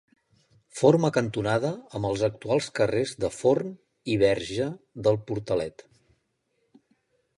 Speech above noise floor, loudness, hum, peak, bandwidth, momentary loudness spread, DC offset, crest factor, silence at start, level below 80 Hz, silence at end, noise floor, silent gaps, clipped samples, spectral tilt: 49 dB; -26 LUFS; none; -6 dBFS; 11.5 kHz; 9 LU; under 0.1%; 22 dB; 0.75 s; -56 dBFS; 1.7 s; -74 dBFS; none; under 0.1%; -6 dB/octave